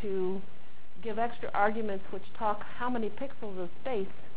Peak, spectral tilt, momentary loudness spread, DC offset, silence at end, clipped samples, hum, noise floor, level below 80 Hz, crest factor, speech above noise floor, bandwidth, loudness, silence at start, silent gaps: -14 dBFS; -9 dB/octave; 11 LU; 4%; 0 s; under 0.1%; none; -56 dBFS; -60 dBFS; 22 dB; 22 dB; 4 kHz; -35 LUFS; 0 s; none